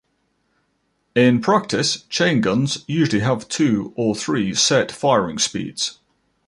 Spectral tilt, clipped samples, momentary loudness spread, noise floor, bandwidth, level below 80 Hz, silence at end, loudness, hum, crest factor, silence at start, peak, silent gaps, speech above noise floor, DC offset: -4 dB/octave; under 0.1%; 7 LU; -68 dBFS; 11.5 kHz; -56 dBFS; 0.55 s; -19 LUFS; none; 18 dB; 1.15 s; -2 dBFS; none; 49 dB; under 0.1%